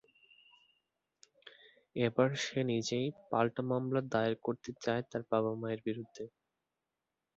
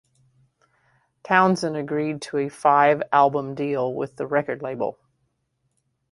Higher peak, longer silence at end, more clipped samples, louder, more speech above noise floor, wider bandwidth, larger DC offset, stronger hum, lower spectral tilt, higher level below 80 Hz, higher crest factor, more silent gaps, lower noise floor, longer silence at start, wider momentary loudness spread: second, -16 dBFS vs -2 dBFS; about the same, 1.1 s vs 1.2 s; neither; second, -35 LUFS vs -22 LUFS; about the same, 54 dB vs 51 dB; second, 7.6 kHz vs 11.5 kHz; neither; neither; about the same, -5 dB/octave vs -6 dB/octave; second, -74 dBFS vs -66 dBFS; about the same, 22 dB vs 22 dB; neither; first, -89 dBFS vs -73 dBFS; first, 1.45 s vs 1.25 s; about the same, 10 LU vs 11 LU